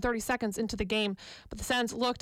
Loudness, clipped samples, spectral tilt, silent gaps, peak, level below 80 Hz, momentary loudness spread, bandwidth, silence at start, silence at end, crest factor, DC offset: -31 LUFS; under 0.1%; -3.5 dB/octave; none; -18 dBFS; -48 dBFS; 11 LU; 16.5 kHz; 0 s; 0 s; 14 dB; under 0.1%